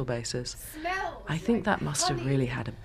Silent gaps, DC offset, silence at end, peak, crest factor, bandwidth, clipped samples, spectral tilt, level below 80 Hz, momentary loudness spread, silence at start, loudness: none; under 0.1%; 0 s; -10 dBFS; 20 dB; 15.5 kHz; under 0.1%; -4.5 dB/octave; -48 dBFS; 7 LU; 0 s; -30 LUFS